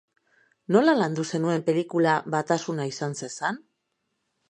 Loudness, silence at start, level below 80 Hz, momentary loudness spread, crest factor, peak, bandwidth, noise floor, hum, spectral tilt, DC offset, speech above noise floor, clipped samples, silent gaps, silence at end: -25 LUFS; 0.7 s; -76 dBFS; 10 LU; 20 dB; -6 dBFS; 10 kHz; -77 dBFS; none; -5.5 dB/octave; under 0.1%; 53 dB; under 0.1%; none; 0.9 s